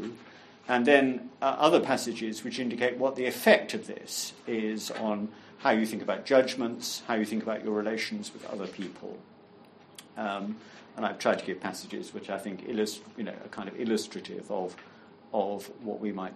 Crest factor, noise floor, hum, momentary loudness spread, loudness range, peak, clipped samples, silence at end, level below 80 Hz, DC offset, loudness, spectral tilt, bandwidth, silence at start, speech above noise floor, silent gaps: 26 dB; -55 dBFS; none; 17 LU; 8 LU; -6 dBFS; under 0.1%; 0 s; -78 dBFS; under 0.1%; -30 LUFS; -4 dB/octave; 13 kHz; 0 s; 25 dB; none